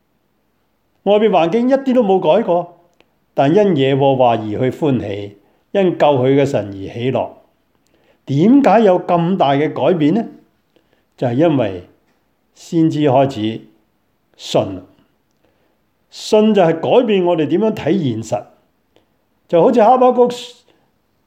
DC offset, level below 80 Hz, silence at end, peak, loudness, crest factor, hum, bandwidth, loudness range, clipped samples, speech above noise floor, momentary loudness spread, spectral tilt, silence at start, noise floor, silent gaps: under 0.1%; -60 dBFS; 0.75 s; 0 dBFS; -15 LUFS; 16 dB; none; 13.5 kHz; 5 LU; under 0.1%; 50 dB; 14 LU; -7 dB/octave; 1.05 s; -64 dBFS; none